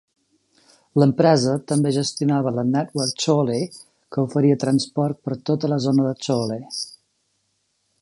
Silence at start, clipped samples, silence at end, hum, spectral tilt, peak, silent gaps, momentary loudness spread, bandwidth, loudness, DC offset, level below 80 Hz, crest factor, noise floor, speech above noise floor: 0.95 s; under 0.1%; 1.1 s; none; -6 dB/octave; -2 dBFS; none; 11 LU; 11.5 kHz; -21 LUFS; under 0.1%; -64 dBFS; 18 dB; -70 dBFS; 50 dB